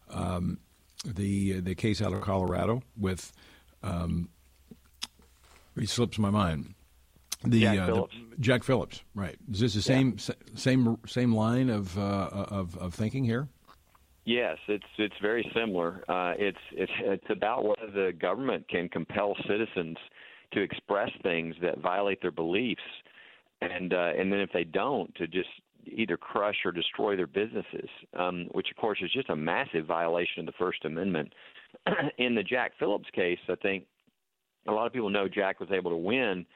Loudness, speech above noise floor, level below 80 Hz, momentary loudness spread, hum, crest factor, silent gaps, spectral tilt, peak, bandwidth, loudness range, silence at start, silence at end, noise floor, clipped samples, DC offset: -30 LUFS; 52 dB; -60 dBFS; 11 LU; none; 20 dB; none; -6 dB/octave; -10 dBFS; 15.5 kHz; 4 LU; 0.1 s; 0.1 s; -82 dBFS; under 0.1%; under 0.1%